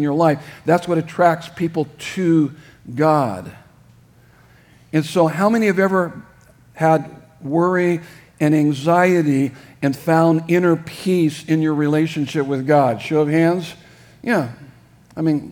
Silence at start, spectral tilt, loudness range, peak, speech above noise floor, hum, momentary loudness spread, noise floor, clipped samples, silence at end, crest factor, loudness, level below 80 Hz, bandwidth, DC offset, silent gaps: 0 s; -7 dB/octave; 4 LU; -2 dBFS; 32 dB; none; 9 LU; -50 dBFS; under 0.1%; 0 s; 18 dB; -18 LUFS; -60 dBFS; 18 kHz; under 0.1%; none